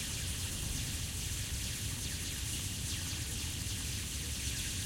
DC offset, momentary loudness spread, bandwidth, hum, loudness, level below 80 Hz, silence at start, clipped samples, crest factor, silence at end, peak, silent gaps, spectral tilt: under 0.1%; 1 LU; 16.5 kHz; none; -37 LUFS; -46 dBFS; 0 s; under 0.1%; 14 dB; 0 s; -24 dBFS; none; -2.5 dB/octave